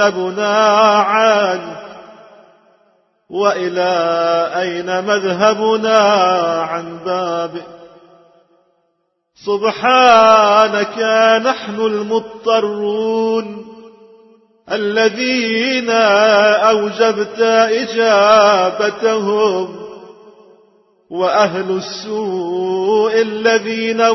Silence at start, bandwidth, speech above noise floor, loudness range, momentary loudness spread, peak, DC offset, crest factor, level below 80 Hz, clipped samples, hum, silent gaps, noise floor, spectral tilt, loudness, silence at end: 0 s; 6.2 kHz; 53 dB; 7 LU; 12 LU; 0 dBFS; under 0.1%; 14 dB; -62 dBFS; under 0.1%; none; none; -67 dBFS; -4 dB/octave; -14 LUFS; 0 s